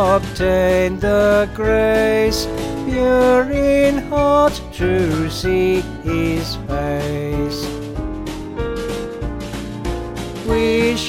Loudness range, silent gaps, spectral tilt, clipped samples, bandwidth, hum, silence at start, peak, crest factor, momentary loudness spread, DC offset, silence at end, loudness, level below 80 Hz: 8 LU; none; -5.5 dB/octave; under 0.1%; 16.5 kHz; none; 0 s; -4 dBFS; 14 dB; 12 LU; under 0.1%; 0 s; -18 LUFS; -30 dBFS